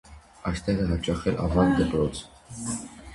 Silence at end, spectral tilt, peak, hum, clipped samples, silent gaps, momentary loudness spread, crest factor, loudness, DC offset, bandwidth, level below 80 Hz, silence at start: 0 s; -6 dB/octave; -8 dBFS; none; under 0.1%; none; 13 LU; 18 dB; -26 LUFS; under 0.1%; 11.5 kHz; -38 dBFS; 0.1 s